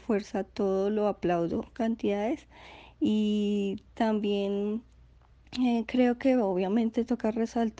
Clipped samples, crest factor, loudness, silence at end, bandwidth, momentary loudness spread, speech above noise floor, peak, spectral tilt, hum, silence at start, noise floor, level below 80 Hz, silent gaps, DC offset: under 0.1%; 16 dB; -29 LUFS; 0.05 s; 8 kHz; 8 LU; 29 dB; -14 dBFS; -7 dB/octave; none; 0.1 s; -57 dBFS; -58 dBFS; none; under 0.1%